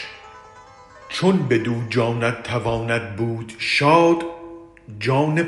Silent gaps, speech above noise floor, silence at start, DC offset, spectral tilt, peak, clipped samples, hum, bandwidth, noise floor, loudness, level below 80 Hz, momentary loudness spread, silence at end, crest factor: none; 25 dB; 0 s; under 0.1%; -6 dB/octave; -2 dBFS; under 0.1%; none; 11.5 kHz; -45 dBFS; -20 LUFS; -52 dBFS; 19 LU; 0 s; 18 dB